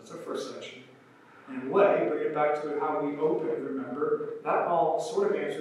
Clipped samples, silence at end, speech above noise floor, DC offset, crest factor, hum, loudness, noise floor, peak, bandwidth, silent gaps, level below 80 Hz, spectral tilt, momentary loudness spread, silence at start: under 0.1%; 0 s; 26 dB; under 0.1%; 18 dB; none; -28 LUFS; -55 dBFS; -10 dBFS; 12 kHz; none; under -90 dBFS; -6 dB/octave; 15 LU; 0 s